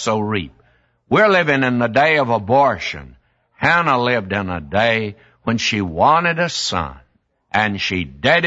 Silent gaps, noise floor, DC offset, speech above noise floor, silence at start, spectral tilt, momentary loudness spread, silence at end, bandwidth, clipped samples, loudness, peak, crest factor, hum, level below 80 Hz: none; -60 dBFS; under 0.1%; 43 dB; 0 s; -4.5 dB/octave; 10 LU; 0 s; 8 kHz; under 0.1%; -17 LUFS; 0 dBFS; 18 dB; none; -46 dBFS